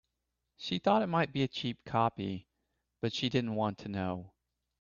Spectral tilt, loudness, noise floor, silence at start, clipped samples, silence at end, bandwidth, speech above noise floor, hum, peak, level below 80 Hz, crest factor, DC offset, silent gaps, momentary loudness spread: -6.5 dB/octave; -33 LUFS; -85 dBFS; 0.6 s; under 0.1%; 0.5 s; 7.4 kHz; 52 dB; none; -14 dBFS; -68 dBFS; 20 dB; under 0.1%; none; 11 LU